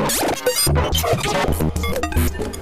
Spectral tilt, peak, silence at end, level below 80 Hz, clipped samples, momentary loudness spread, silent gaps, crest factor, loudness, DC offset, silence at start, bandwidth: -4 dB/octave; -6 dBFS; 0 s; -26 dBFS; under 0.1%; 5 LU; none; 12 dB; -19 LUFS; 1%; 0 s; 16 kHz